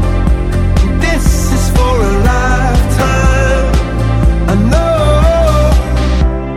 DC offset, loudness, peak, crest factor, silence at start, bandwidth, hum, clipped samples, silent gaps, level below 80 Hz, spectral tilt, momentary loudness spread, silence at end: under 0.1%; -12 LUFS; 0 dBFS; 10 dB; 0 s; 14.5 kHz; none; under 0.1%; none; -12 dBFS; -6 dB/octave; 4 LU; 0 s